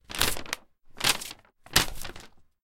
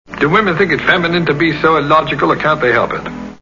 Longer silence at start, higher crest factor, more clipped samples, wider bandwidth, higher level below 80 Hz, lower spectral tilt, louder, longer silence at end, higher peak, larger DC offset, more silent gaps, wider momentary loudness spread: about the same, 0.1 s vs 0.1 s; first, 30 dB vs 14 dB; neither; first, 17 kHz vs 7.4 kHz; about the same, -44 dBFS vs -42 dBFS; second, -1 dB/octave vs -6.5 dB/octave; second, -27 LUFS vs -13 LUFS; first, 0.25 s vs 0.05 s; about the same, -2 dBFS vs 0 dBFS; second, under 0.1% vs 0.2%; neither; first, 16 LU vs 3 LU